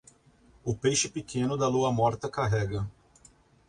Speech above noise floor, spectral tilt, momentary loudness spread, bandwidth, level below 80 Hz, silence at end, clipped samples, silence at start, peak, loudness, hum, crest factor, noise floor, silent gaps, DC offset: 32 dB; -4.5 dB/octave; 10 LU; 11.5 kHz; -52 dBFS; 0.8 s; under 0.1%; 0.65 s; -12 dBFS; -28 LUFS; none; 18 dB; -60 dBFS; none; under 0.1%